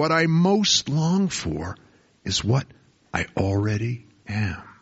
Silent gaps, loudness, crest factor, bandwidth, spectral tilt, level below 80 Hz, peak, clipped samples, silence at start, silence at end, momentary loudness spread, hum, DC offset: none; -23 LUFS; 18 dB; 8 kHz; -4.5 dB/octave; -48 dBFS; -4 dBFS; under 0.1%; 0 s; 0.1 s; 16 LU; none; under 0.1%